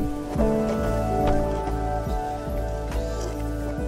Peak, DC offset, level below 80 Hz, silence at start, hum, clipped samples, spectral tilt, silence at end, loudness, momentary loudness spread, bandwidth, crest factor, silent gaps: -8 dBFS; under 0.1%; -30 dBFS; 0 s; none; under 0.1%; -7 dB/octave; 0 s; -26 LUFS; 6 LU; 15.5 kHz; 16 dB; none